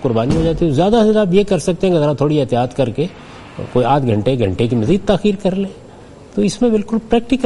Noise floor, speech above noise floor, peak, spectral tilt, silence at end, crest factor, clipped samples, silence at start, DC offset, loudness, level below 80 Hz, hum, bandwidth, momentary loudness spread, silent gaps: -38 dBFS; 23 dB; 0 dBFS; -7 dB/octave; 0 s; 14 dB; under 0.1%; 0 s; under 0.1%; -16 LUFS; -36 dBFS; none; 11.5 kHz; 10 LU; none